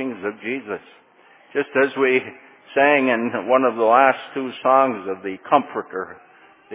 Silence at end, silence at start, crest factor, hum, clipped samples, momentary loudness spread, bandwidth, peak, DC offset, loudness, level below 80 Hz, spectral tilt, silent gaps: 0 s; 0 s; 20 dB; none; under 0.1%; 15 LU; 3.9 kHz; 0 dBFS; under 0.1%; -20 LUFS; -72 dBFS; -8.5 dB/octave; none